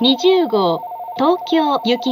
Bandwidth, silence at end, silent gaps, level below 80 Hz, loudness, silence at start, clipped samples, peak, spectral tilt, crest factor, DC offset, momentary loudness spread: 15.5 kHz; 0 s; none; -70 dBFS; -16 LUFS; 0 s; under 0.1%; -2 dBFS; -5 dB/octave; 14 dB; under 0.1%; 7 LU